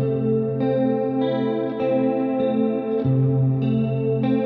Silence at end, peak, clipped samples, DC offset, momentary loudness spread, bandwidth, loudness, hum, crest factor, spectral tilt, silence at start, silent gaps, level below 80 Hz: 0 s; -10 dBFS; under 0.1%; under 0.1%; 3 LU; 4.4 kHz; -21 LUFS; none; 12 dB; -11.5 dB/octave; 0 s; none; -56 dBFS